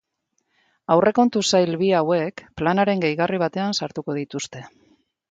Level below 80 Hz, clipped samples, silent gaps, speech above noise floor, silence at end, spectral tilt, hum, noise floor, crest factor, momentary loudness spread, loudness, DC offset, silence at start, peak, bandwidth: -58 dBFS; under 0.1%; none; 53 dB; 0.6 s; -5 dB/octave; none; -73 dBFS; 20 dB; 12 LU; -21 LUFS; under 0.1%; 0.9 s; -2 dBFS; 9.4 kHz